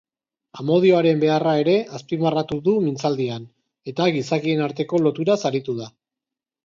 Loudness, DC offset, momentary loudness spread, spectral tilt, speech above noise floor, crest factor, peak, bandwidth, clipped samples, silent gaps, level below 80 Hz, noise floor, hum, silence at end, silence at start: -21 LUFS; under 0.1%; 13 LU; -6.5 dB/octave; 68 dB; 16 dB; -4 dBFS; 7.6 kHz; under 0.1%; none; -64 dBFS; -88 dBFS; none; 0.75 s; 0.55 s